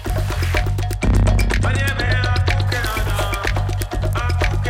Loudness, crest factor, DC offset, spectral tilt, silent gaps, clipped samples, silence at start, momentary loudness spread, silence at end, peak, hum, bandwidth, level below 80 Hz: -20 LUFS; 14 dB; under 0.1%; -5.5 dB/octave; none; under 0.1%; 0 s; 5 LU; 0 s; -4 dBFS; 50 Hz at -25 dBFS; 16.5 kHz; -22 dBFS